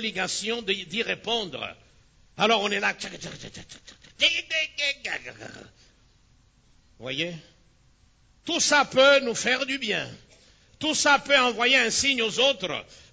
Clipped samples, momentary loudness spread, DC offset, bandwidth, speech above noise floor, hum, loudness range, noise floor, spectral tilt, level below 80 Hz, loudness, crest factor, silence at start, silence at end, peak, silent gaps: under 0.1%; 19 LU; under 0.1%; 8 kHz; 35 dB; none; 10 LU; -60 dBFS; -1.5 dB/octave; -60 dBFS; -23 LUFS; 20 dB; 0 s; 0.15 s; -6 dBFS; none